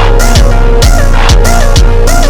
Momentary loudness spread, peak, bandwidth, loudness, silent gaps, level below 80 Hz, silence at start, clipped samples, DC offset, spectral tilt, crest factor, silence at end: 1 LU; 0 dBFS; 16 kHz; -8 LUFS; none; -4 dBFS; 0 s; 6%; under 0.1%; -4.5 dB/octave; 4 dB; 0 s